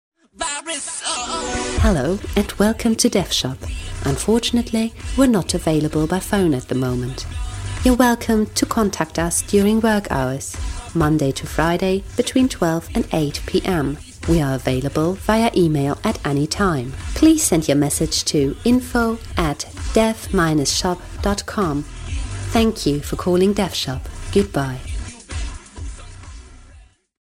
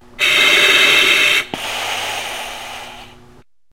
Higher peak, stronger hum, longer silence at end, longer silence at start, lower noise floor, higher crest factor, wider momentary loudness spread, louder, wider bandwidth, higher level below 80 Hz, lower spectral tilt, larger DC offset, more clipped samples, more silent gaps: about the same, 0 dBFS vs 0 dBFS; neither; second, 0.4 s vs 0.65 s; first, 0.4 s vs 0.2 s; about the same, -47 dBFS vs -48 dBFS; about the same, 20 dB vs 16 dB; second, 12 LU vs 19 LU; second, -19 LUFS vs -12 LUFS; about the same, 16 kHz vs 16 kHz; first, -32 dBFS vs -50 dBFS; first, -5 dB/octave vs 0 dB/octave; second, under 0.1% vs 0.4%; neither; neither